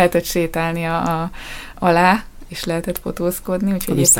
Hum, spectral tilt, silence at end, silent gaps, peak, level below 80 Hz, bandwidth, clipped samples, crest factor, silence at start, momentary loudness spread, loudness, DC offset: none; -4 dB/octave; 0 s; none; 0 dBFS; -38 dBFS; 17 kHz; under 0.1%; 18 dB; 0 s; 13 LU; -19 LUFS; under 0.1%